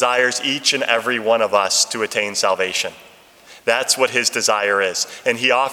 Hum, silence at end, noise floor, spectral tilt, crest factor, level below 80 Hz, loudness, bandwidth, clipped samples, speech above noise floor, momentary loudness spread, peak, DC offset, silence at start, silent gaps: none; 0 s; -45 dBFS; -0.5 dB/octave; 18 dB; -70 dBFS; -17 LUFS; 18.5 kHz; under 0.1%; 27 dB; 5 LU; 0 dBFS; under 0.1%; 0 s; none